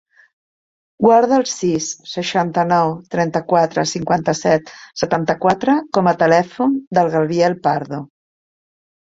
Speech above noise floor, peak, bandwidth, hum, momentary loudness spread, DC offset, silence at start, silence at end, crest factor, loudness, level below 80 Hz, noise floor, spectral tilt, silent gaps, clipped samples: over 74 dB; 0 dBFS; 8 kHz; none; 8 LU; under 0.1%; 1 s; 0.95 s; 18 dB; -17 LUFS; -56 dBFS; under -90 dBFS; -5 dB/octave; 6.87-6.91 s; under 0.1%